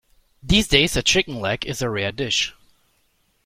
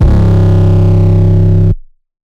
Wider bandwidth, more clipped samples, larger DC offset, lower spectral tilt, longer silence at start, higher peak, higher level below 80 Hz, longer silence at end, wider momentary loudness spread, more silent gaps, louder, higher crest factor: first, 16.5 kHz vs 4.7 kHz; neither; neither; second, -3 dB/octave vs -10 dB/octave; first, 0.45 s vs 0 s; about the same, 0 dBFS vs 0 dBFS; second, -36 dBFS vs -14 dBFS; first, 0.95 s vs 0.5 s; first, 9 LU vs 4 LU; neither; second, -20 LUFS vs -9 LUFS; first, 22 dB vs 8 dB